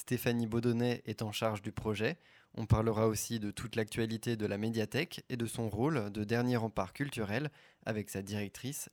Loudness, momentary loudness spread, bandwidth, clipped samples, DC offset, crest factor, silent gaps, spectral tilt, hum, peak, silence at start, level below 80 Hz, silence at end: -35 LUFS; 8 LU; 19 kHz; under 0.1%; under 0.1%; 20 dB; none; -5.5 dB/octave; none; -14 dBFS; 0 s; -56 dBFS; 0.05 s